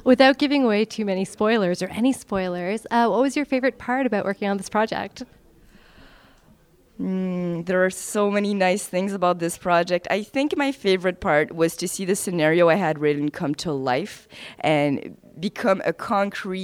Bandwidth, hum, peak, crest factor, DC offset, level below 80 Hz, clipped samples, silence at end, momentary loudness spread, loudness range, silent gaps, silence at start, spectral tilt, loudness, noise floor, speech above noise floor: 16.5 kHz; none; -4 dBFS; 18 dB; under 0.1%; -56 dBFS; under 0.1%; 0 s; 8 LU; 6 LU; none; 0.05 s; -5 dB/octave; -22 LUFS; -55 dBFS; 33 dB